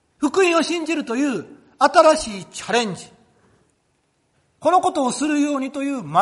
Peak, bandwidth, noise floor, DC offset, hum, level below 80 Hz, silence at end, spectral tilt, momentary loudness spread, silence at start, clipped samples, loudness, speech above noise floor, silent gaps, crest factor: 0 dBFS; 11.5 kHz; -66 dBFS; under 0.1%; none; -56 dBFS; 0 s; -3.5 dB/octave; 12 LU; 0.2 s; under 0.1%; -19 LUFS; 48 dB; none; 20 dB